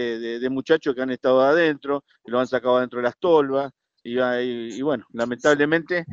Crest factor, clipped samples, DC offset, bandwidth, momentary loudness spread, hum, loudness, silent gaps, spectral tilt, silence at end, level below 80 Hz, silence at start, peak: 18 dB; under 0.1%; under 0.1%; 7.8 kHz; 10 LU; none; -22 LUFS; none; -5.5 dB/octave; 0 s; -64 dBFS; 0 s; -4 dBFS